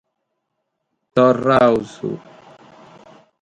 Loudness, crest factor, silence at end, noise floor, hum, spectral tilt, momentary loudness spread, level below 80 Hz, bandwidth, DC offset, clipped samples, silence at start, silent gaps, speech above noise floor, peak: -17 LUFS; 20 dB; 1.25 s; -75 dBFS; none; -7 dB/octave; 15 LU; -56 dBFS; 9.4 kHz; under 0.1%; under 0.1%; 1.15 s; none; 59 dB; 0 dBFS